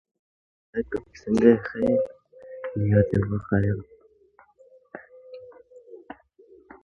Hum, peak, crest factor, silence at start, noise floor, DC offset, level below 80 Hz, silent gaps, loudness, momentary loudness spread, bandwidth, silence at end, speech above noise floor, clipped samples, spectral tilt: none; -4 dBFS; 22 dB; 0.75 s; -59 dBFS; under 0.1%; -48 dBFS; none; -24 LUFS; 26 LU; 9.6 kHz; 0.7 s; 36 dB; under 0.1%; -9.5 dB/octave